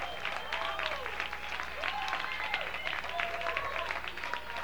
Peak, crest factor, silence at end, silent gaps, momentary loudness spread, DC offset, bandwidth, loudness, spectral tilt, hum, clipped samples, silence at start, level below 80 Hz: -14 dBFS; 24 dB; 0 s; none; 4 LU; 0.6%; over 20 kHz; -35 LUFS; -2 dB/octave; none; under 0.1%; 0 s; -56 dBFS